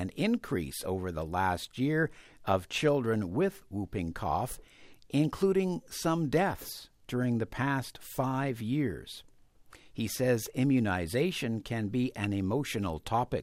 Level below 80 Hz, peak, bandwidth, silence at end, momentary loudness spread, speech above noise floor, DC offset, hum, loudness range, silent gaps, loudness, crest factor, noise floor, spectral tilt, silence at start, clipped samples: -54 dBFS; -14 dBFS; 16 kHz; 0 s; 9 LU; 26 dB; under 0.1%; none; 2 LU; none; -32 LUFS; 18 dB; -57 dBFS; -6 dB/octave; 0 s; under 0.1%